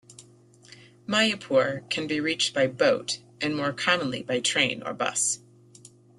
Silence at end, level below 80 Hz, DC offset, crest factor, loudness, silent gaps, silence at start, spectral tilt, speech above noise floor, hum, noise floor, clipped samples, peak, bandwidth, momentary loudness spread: 0.3 s; -68 dBFS; under 0.1%; 20 dB; -25 LUFS; none; 0.1 s; -2.5 dB/octave; 29 dB; none; -54 dBFS; under 0.1%; -6 dBFS; 12.5 kHz; 7 LU